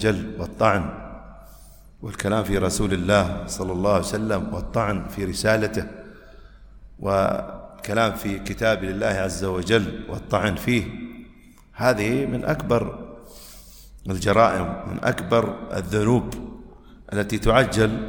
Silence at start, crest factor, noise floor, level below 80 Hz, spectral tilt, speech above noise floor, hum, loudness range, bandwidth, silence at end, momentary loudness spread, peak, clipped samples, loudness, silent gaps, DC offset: 0 s; 20 dB; -49 dBFS; -40 dBFS; -5.5 dB/octave; 26 dB; none; 3 LU; 19.5 kHz; 0 s; 19 LU; -2 dBFS; under 0.1%; -23 LUFS; none; under 0.1%